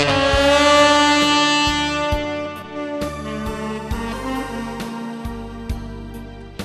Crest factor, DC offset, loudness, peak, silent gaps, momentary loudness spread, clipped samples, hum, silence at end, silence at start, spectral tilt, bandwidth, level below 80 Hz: 20 dB; under 0.1%; -18 LUFS; 0 dBFS; none; 18 LU; under 0.1%; none; 0 s; 0 s; -3.5 dB/octave; 14 kHz; -34 dBFS